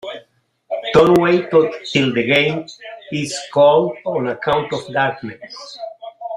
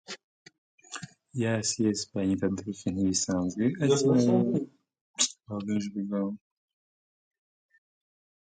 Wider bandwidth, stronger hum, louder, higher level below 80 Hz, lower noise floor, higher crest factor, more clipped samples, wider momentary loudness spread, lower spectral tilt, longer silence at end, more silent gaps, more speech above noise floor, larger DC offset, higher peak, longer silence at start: first, 15.5 kHz vs 9.6 kHz; neither; first, -16 LUFS vs -28 LUFS; first, -52 dBFS vs -60 dBFS; second, -56 dBFS vs under -90 dBFS; second, 16 dB vs 24 dB; neither; about the same, 20 LU vs 19 LU; about the same, -5.5 dB/octave vs -4.5 dB/octave; second, 0 s vs 2.15 s; second, none vs 0.24-0.46 s, 0.58-0.78 s, 5.01-5.14 s; second, 39 dB vs over 63 dB; neither; first, -2 dBFS vs -6 dBFS; about the same, 0.05 s vs 0.1 s